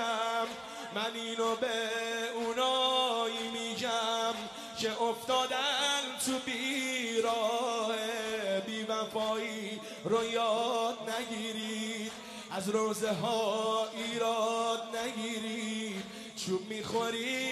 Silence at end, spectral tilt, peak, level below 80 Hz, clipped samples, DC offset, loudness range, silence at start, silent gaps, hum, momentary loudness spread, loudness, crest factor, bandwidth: 0 s; -2.5 dB/octave; -16 dBFS; -74 dBFS; under 0.1%; under 0.1%; 3 LU; 0 s; none; none; 8 LU; -33 LUFS; 16 dB; 13 kHz